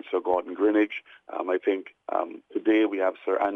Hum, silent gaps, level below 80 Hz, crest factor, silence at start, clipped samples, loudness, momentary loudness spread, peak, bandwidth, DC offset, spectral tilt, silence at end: none; none; -72 dBFS; 14 dB; 0.05 s; under 0.1%; -26 LUFS; 10 LU; -12 dBFS; 3.8 kHz; under 0.1%; -6.5 dB/octave; 0 s